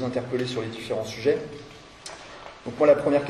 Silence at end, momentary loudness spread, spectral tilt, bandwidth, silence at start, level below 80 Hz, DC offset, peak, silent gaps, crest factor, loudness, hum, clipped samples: 0 s; 22 LU; -5.5 dB/octave; 12 kHz; 0 s; -58 dBFS; under 0.1%; -6 dBFS; none; 20 dB; -25 LUFS; none; under 0.1%